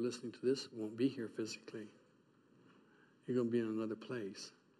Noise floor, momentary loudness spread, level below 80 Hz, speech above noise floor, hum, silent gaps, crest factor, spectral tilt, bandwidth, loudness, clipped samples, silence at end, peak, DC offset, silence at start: -70 dBFS; 14 LU; -88 dBFS; 30 dB; none; none; 18 dB; -5.5 dB/octave; 12 kHz; -41 LUFS; under 0.1%; 0.3 s; -24 dBFS; under 0.1%; 0 s